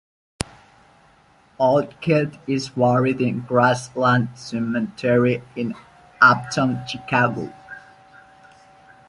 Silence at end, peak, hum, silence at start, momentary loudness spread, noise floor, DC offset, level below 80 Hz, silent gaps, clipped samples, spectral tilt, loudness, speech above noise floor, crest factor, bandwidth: 1.3 s; -2 dBFS; none; 1.6 s; 15 LU; -55 dBFS; under 0.1%; -54 dBFS; none; under 0.1%; -6 dB/octave; -20 LUFS; 35 dB; 20 dB; 11.5 kHz